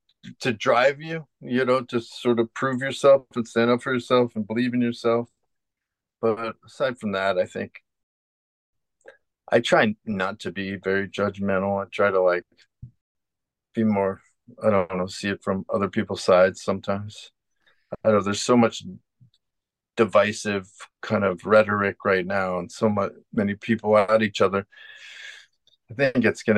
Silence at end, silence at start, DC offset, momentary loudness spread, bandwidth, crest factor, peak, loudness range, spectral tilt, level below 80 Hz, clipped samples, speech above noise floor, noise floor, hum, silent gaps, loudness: 0 s; 0.25 s; under 0.1%; 14 LU; 11.5 kHz; 20 dB; -4 dBFS; 5 LU; -5.5 dB/octave; -66 dBFS; under 0.1%; 63 dB; -86 dBFS; none; 8.03-8.73 s, 13.01-13.15 s; -23 LUFS